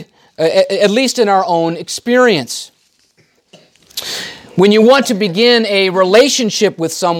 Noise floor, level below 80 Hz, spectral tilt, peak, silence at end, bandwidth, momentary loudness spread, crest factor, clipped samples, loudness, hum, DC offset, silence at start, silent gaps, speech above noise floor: -55 dBFS; -64 dBFS; -3.5 dB/octave; 0 dBFS; 0 s; 17 kHz; 13 LU; 12 dB; under 0.1%; -12 LUFS; none; under 0.1%; 0 s; none; 43 dB